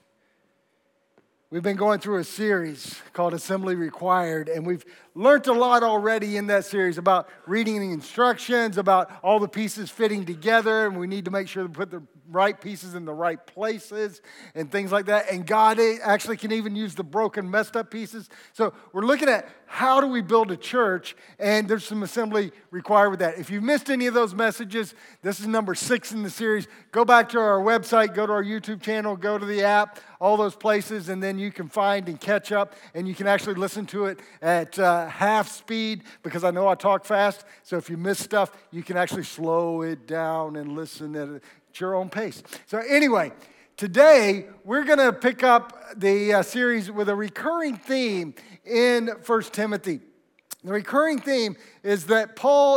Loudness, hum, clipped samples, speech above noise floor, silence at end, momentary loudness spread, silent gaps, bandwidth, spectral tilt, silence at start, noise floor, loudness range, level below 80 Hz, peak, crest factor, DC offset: -23 LUFS; none; under 0.1%; 45 dB; 0 s; 13 LU; none; 18 kHz; -4.5 dB/octave; 1.5 s; -69 dBFS; 6 LU; -82 dBFS; -2 dBFS; 22 dB; under 0.1%